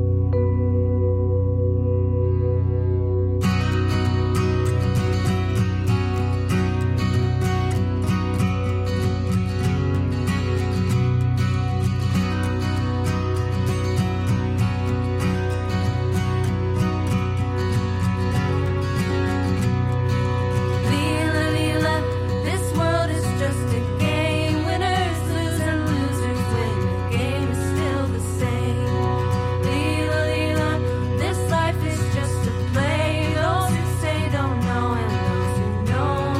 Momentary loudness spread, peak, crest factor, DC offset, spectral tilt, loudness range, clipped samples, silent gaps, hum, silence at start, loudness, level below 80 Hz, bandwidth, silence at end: 2 LU; -10 dBFS; 12 dB; under 0.1%; -6.5 dB/octave; 1 LU; under 0.1%; none; none; 0 s; -22 LUFS; -36 dBFS; 14 kHz; 0 s